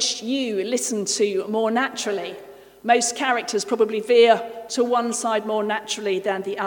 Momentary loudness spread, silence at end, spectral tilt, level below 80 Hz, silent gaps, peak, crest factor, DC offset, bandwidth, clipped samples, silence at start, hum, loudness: 9 LU; 0 s; -2.5 dB/octave; -70 dBFS; none; -4 dBFS; 18 dB; under 0.1%; 19 kHz; under 0.1%; 0 s; none; -22 LUFS